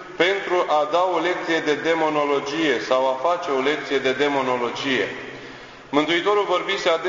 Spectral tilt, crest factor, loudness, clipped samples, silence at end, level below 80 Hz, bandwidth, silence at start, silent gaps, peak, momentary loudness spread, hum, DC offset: -4 dB/octave; 18 dB; -21 LUFS; under 0.1%; 0 s; -62 dBFS; 7.6 kHz; 0 s; none; -4 dBFS; 5 LU; none; under 0.1%